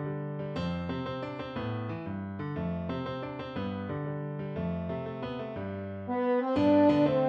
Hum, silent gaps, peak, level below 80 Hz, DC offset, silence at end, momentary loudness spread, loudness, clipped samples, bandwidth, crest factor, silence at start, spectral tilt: none; none; -14 dBFS; -56 dBFS; under 0.1%; 0 s; 13 LU; -32 LUFS; under 0.1%; 7 kHz; 18 dB; 0 s; -9 dB/octave